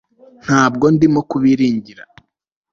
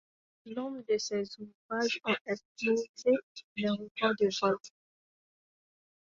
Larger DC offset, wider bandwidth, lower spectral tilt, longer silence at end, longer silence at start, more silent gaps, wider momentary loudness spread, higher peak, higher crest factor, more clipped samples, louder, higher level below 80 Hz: neither; about the same, 7.4 kHz vs 7.8 kHz; first, -6.5 dB/octave vs -4 dB/octave; second, 0.7 s vs 1.35 s; about the same, 0.45 s vs 0.45 s; second, none vs 1.55-1.69 s, 2.21-2.25 s, 2.45-2.55 s, 2.89-2.94 s, 3.23-3.35 s, 3.44-3.56 s, 3.91-3.95 s; second, 8 LU vs 11 LU; first, -2 dBFS vs -16 dBFS; about the same, 14 dB vs 18 dB; neither; first, -14 LUFS vs -32 LUFS; first, -50 dBFS vs -76 dBFS